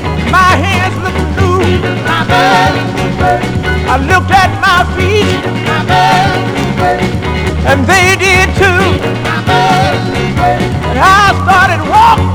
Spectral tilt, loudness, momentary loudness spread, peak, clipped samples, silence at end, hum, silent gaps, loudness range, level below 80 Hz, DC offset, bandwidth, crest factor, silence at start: -5 dB/octave; -9 LUFS; 7 LU; 0 dBFS; 0.9%; 0 s; none; none; 2 LU; -24 dBFS; under 0.1%; over 20 kHz; 10 dB; 0 s